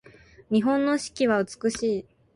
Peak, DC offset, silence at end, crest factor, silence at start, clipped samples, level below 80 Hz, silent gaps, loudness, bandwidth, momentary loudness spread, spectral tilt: -10 dBFS; under 0.1%; 0.35 s; 16 dB; 0.5 s; under 0.1%; -60 dBFS; none; -25 LUFS; 11.5 kHz; 5 LU; -5 dB/octave